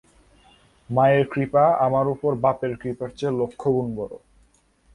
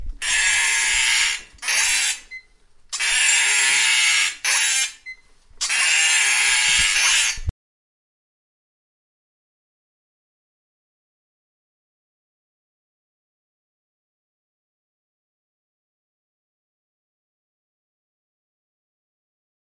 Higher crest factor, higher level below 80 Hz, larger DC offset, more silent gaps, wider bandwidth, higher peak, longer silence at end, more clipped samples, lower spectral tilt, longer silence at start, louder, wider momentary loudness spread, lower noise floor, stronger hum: about the same, 16 dB vs 20 dB; second, -56 dBFS vs -46 dBFS; neither; neither; about the same, 11 kHz vs 11.5 kHz; about the same, -6 dBFS vs -4 dBFS; second, 0.8 s vs 12.2 s; neither; first, -8.5 dB/octave vs 2.5 dB/octave; first, 0.9 s vs 0 s; second, -22 LUFS vs -17 LUFS; first, 12 LU vs 9 LU; first, -60 dBFS vs -51 dBFS; neither